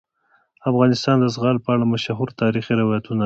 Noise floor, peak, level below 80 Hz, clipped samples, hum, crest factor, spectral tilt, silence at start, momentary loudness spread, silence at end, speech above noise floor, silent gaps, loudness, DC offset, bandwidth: -62 dBFS; -4 dBFS; -56 dBFS; under 0.1%; none; 16 dB; -7 dB/octave; 0.65 s; 5 LU; 0 s; 44 dB; none; -20 LUFS; under 0.1%; 7.8 kHz